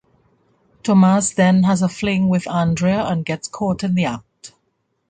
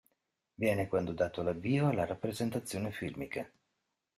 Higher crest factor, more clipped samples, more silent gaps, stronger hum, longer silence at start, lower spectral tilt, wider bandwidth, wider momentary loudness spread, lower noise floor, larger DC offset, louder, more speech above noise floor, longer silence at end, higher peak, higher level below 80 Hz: about the same, 16 dB vs 18 dB; neither; neither; neither; first, 0.85 s vs 0.6 s; about the same, -6 dB/octave vs -6.5 dB/octave; second, 9.4 kHz vs 15 kHz; about the same, 9 LU vs 9 LU; second, -69 dBFS vs -84 dBFS; neither; first, -18 LUFS vs -35 LUFS; about the same, 52 dB vs 51 dB; about the same, 0.6 s vs 0.7 s; first, -4 dBFS vs -18 dBFS; first, -50 dBFS vs -64 dBFS